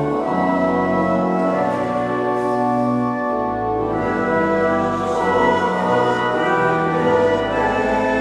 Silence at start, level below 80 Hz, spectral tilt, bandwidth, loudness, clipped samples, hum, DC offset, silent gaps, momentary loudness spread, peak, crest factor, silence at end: 0 s; -44 dBFS; -7 dB/octave; 11 kHz; -18 LUFS; under 0.1%; none; under 0.1%; none; 4 LU; -4 dBFS; 14 dB; 0 s